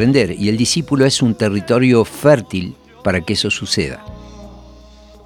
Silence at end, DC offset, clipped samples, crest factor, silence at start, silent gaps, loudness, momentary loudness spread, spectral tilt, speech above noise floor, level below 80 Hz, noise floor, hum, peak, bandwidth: 0.6 s; under 0.1%; under 0.1%; 16 dB; 0 s; none; -16 LUFS; 11 LU; -5 dB/octave; 26 dB; -42 dBFS; -41 dBFS; none; 0 dBFS; 18 kHz